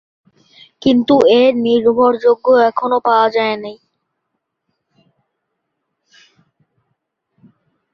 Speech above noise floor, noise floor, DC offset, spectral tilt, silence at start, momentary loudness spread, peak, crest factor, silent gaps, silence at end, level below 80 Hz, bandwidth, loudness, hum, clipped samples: 62 dB; -74 dBFS; under 0.1%; -6 dB/octave; 0.85 s; 8 LU; -2 dBFS; 16 dB; none; 4.2 s; -58 dBFS; 7 kHz; -13 LUFS; none; under 0.1%